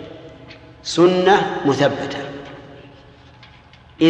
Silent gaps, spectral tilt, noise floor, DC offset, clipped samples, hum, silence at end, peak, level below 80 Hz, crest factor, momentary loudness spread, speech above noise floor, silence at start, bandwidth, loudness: none; -5.5 dB/octave; -46 dBFS; under 0.1%; under 0.1%; none; 0 s; -2 dBFS; -54 dBFS; 18 dB; 25 LU; 30 dB; 0 s; 9 kHz; -17 LUFS